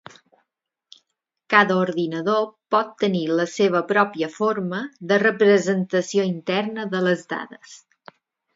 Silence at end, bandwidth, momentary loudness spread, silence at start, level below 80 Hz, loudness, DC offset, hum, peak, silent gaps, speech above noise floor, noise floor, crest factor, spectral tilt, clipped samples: 0.8 s; 7.8 kHz; 9 LU; 1.5 s; -72 dBFS; -21 LUFS; under 0.1%; none; 0 dBFS; none; 58 dB; -79 dBFS; 22 dB; -5.5 dB/octave; under 0.1%